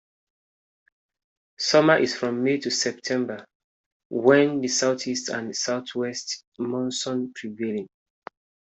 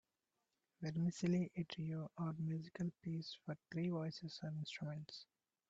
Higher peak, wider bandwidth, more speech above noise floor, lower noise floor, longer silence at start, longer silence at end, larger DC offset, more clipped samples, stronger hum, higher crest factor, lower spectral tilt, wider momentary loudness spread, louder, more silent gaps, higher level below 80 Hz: first, -4 dBFS vs -28 dBFS; about the same, 8.4 kHz vs 7.8 kHz; first, over 66 dB vs 46 dB; about the same, under -90 dBFS vs -90 dBFS; first, 1.6 s vs 0.8 s; first, 0.9 s vs 0.45 s; neither; neither; neither; first, 22 dB vs 16 dB; second, -3.5 dB/octave vs -7 dB/octave; first, 14 LU vs 10 LU; first, -24 LUFS vs -45 LUFS; first, 3.55-4.10 s, 6.47-6.52 s vs none; first, -72 dBFS vs -78 dBFS